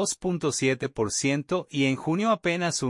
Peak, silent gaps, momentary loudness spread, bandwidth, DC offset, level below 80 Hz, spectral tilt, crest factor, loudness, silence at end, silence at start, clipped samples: -12 dBFS; none; 3 LU; 11.5 kHz; under 0.1%; -60 dBFS; -4 dB/octave; 14 dB; -26 LUFS; 0 s; 0 s; under 0.1%